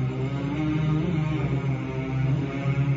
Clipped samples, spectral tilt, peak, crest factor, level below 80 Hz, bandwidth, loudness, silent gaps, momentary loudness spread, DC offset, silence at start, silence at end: under 0.1%; -8 dB/octave; -14 dBFS; 12 dB; -42 dBFS; 7.4 kHz; -26 LUFS; none; 4 LU; under 0.1%; 0 s; 0 s